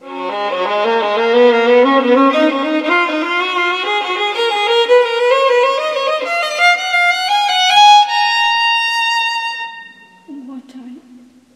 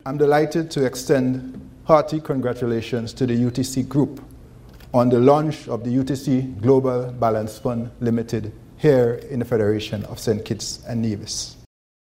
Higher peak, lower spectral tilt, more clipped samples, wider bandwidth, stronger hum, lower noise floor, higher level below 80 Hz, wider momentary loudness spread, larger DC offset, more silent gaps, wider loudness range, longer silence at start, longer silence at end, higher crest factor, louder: about the same, 0 dBFS vs 0 dBFS; second, -1 dB/octave vs -6.5 dB/octave; neither; second, 13.5 kHz vs 16 kHz; neither; about the same, -43 dBFS vs -43 dBFS; second, -70 dBFS vs -48 dBFS; about the same, 9 LU vs 10 LU; neither; neither; about the same, 3 LU vs 3 LU; about the same, 0.05 s vs 0.05 s; about the same, 0.55 s vs 0.6 s; second, 14 dB vs 20 dB; first, -12 LUFS vs -21 LUFS